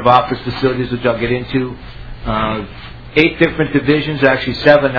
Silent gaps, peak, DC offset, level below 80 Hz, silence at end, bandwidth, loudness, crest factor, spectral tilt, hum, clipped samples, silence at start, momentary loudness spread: none; 0 dBFS; 0.7%; -34 dBFS; 0 s; 5.4 kHz; -15 LUFS; 14 dB; -8 dB/octave; none; 0.2%; 0 s; 15 LU